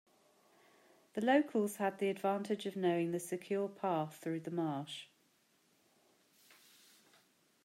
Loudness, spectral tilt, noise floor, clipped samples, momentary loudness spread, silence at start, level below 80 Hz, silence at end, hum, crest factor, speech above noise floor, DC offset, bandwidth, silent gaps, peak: -37 LUFS; -5.5 dB/octave; -74 dBFS; under 0.1%; 10 LU; 1.15 s; -90 dBFS; 2.6 s; none; 20 dB; 38 dB; under 0.1%; 16 kHz; none; -18 dBFS